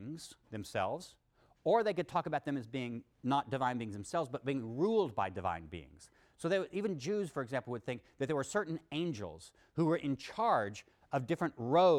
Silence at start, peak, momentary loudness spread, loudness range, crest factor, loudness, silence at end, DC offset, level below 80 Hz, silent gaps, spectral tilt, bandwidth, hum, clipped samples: 0 s; -18 dBFS; 12 LU; 2 LU; 18 dB; -36 LUFS; 0 s; under 0.1%; -68 dBFS; none; -6 dB/octave; 14.5 kHz; none; under 0.1%